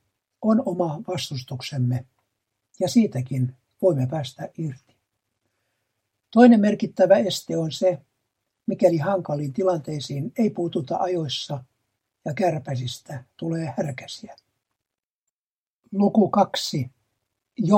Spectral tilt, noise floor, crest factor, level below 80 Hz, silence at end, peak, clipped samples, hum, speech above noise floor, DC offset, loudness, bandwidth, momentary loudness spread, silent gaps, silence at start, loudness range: -6.5 dB/octave; under -90 dBFS; 22 dB; -68 dBFS; 0 s; 0 dBFS; under 0.1%; none; over 68 dB; under 0.1%; -23 LUFS; 16 kHz; 15 LU; 15.05-15.26 s, 15.32-15.79 s; 0.4 s; 9 LU